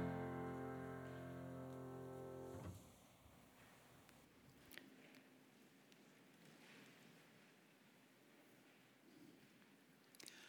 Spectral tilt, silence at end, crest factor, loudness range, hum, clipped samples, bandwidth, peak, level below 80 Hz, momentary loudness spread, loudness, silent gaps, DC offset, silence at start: -6 dB/octave; 0 s; 22 dB; 13 LU; none; under 0.1%; over 20 kHz; -34 dBFS; -80 dBFS; 18 LU; -56 LUFS; none; under 0.1%; 0 s